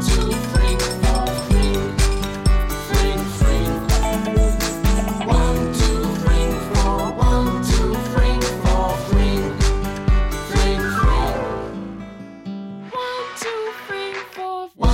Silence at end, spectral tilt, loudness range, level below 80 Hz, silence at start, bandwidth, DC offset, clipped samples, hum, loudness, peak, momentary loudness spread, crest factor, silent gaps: 0 s; -5.5 dB/octave; 5 LU; -20 dBFS; 0 s; 17 kHz; under 0.1%; under 0.1%; none; -20 LUFS; -4 dBFS; 10 LU; 14 dB; none